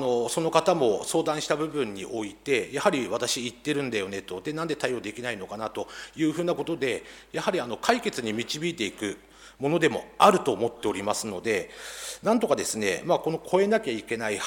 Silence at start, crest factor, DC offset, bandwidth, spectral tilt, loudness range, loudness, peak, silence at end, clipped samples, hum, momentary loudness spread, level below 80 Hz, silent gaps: 0 s; 22 dB; under 0.1%; 18.5 kHz; -4 dB/octave; 5 LU; -27 LUFS; -6 dBFS; 0 s; under 0.1%; none; 10 LU; -62 dBFS; none